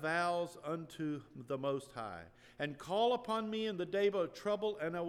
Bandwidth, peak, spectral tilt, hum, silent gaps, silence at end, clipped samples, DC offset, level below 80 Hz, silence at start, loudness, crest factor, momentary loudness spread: 13.5 kHz; -22 dBFS; -5.5 dB/octave; none; none; 0 s; under 0.1%; under 0.1%; -74 dBFS; 0 s; -38 LUFS; 16 dB; 12 LU